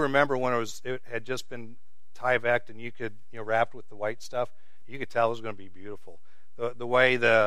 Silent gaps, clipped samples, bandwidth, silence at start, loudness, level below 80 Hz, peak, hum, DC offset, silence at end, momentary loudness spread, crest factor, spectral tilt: none; under 0.1%; 14.5 kHz; 0 s; -28 LUFS; -68 dBFS; -6 dBFS; none; 2%; 0 s; 20 LU; 22 dB; -5 dB/octave